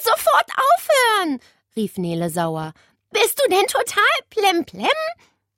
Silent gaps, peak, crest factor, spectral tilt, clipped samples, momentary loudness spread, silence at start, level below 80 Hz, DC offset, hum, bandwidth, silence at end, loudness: none; -4 dBFS; 16 dB; -3 dB/octave; under 0.1%; 12 LU; 0 s; -64 dBFS; under 0.1%; none; 16.5 kHz; 0.45 s; -19 LUFS